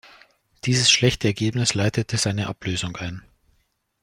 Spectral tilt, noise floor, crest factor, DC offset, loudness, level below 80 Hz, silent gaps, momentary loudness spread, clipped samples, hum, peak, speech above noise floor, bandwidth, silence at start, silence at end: -3.5 dB/octave; -68 dBFS; 20 dB; under 0.1%; -21 LUFS; -50 dBFS; none; 15 LU; under 0.1%; none; -4 dBFS; 46 dB; 15.5 kHz; 0.65 s; 0.8 s